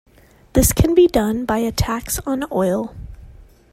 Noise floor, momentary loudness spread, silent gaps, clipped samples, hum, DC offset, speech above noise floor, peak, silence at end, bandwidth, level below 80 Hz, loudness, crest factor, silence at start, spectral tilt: -43 dBFS; 9 LU; none; under 0.1%; none; under 0.1%; 26 dB; 0 dBFS; 0.3 s; 16.5 kHz; -30 dBFS; -18 LUFS; 18 dB; 0.55 s; -5.5 dB/octave